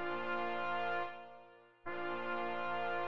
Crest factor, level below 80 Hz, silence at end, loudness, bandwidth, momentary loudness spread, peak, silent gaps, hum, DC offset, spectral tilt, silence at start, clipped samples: 12 dB; -76 dBFS; 0 s; -39 LUFS; 7 kHz; 14 LU; -26 dBFS; none; none; 0.5%; -6 dB/octave; 0 s; under 0.1%